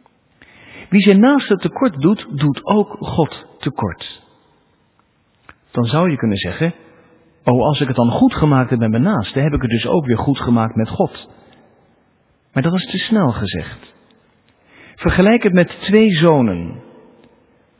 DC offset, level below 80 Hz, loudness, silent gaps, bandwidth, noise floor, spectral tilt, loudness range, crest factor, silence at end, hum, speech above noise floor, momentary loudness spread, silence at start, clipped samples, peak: under 0.1%; -40 dBFS; -16 LUFS; none; 4 kHz; -59 dBFS; -11.5 dB/octave; 6 LU; 16 dB; 1 s; none; 44 dB; 12 LU; 0.75 s; under 0.1%; 0 dBFS